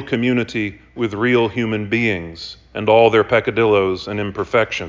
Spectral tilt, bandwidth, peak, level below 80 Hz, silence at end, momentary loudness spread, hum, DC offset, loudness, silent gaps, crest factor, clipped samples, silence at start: -6.5 dB/octave; 7.6 kHz; -2 dBFS; -46 dBFS; 0 s; 12 LU; none; under 0.1%; -17 LUFS; none; 16 dB; under 0.1%; 0 s